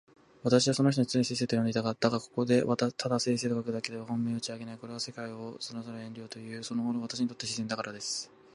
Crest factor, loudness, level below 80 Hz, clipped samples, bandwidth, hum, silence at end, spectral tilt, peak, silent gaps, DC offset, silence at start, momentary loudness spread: 22 dB; -31 LUFS; -70 dBFS; under 0.1%; 11.5 kHz; none; 0.3 s; -5 dB/octave; -10 dBFS; none; under 0.1%; 0.45 s; 14 LU